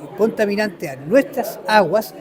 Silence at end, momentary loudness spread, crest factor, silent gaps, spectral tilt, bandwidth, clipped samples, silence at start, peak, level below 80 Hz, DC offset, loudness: 0 s; 9 LU; 18 dB; none; -5 dB/octave; 20 kHz; under 0.1%; 0 s; 0 dBFS; -62 dBFS; under 0.1%; -18 LUFS